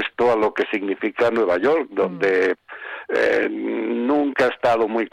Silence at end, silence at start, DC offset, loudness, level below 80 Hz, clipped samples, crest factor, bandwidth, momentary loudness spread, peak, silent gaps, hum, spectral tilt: 0.05 s; 0 s; under 0.1%; -20 LUFS; -60 dBFS; under 0.1%; 12 dB; 10 kHz; 6 LU; -8 dBFS; none; none; -5.5 dB/octave